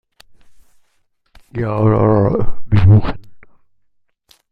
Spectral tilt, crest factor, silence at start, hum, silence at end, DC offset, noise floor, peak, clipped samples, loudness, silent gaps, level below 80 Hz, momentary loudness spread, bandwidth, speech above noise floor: -10.5 dB/octave; 16 dB; 1.55 s; none; 1.1 s; under 0.1%; -64 dBFS; 0 dBFS; under 0.1%; -15 LUFS; none; -32 dBFS; 17 LU; 4.9 kHz; 52 dB